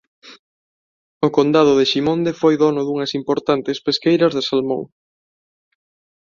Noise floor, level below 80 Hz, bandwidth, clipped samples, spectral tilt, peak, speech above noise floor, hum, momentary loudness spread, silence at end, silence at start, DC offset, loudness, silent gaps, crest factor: under -90 dBFS; -60 dBFS; 7.4 kHz; under 0.1%; -6 dB/octave; -2 dBFS; over 73 dB; none; 8 LU; 1.35 s; 0.25 s; under 0.1%; -17 LUFS; 0.39-1.21 s; 16 dB